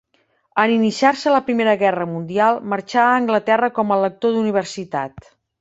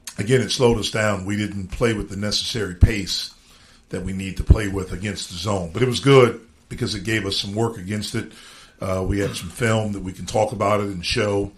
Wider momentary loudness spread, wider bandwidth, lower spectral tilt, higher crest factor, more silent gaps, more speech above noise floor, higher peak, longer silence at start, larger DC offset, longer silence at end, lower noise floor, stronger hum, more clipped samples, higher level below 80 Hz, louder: about the same, 10 LU vs 10 LU; second, 8 kHz vs 14.5 kHz; about the same, -5.5 dB/octave vs -5 dB/octave; about the same, 18 dB vs 22 dB; neither; first, 45 dB vs 30 dB; about the same, -2 dBFS vs 0 dBFS; first, 0.55 s vs 0.05 s; neither; first, 0.4 s vs 0.05 s; first, -63 dBFS vs -51 dBFS; neither; neither; second, -60 dBFS vs -30 dBFS; first, -18 LUFS vs -22 LUFS